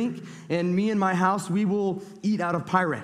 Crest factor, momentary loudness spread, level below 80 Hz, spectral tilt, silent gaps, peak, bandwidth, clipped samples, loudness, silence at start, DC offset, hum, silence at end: 18 dB; 7 LU; -66 dBFS; -6.5 dB/octave; none; -6 dBFS; 13 kHz; under 0.1%; -25 LUFS; 0 s; under 0.1%; none; 0 s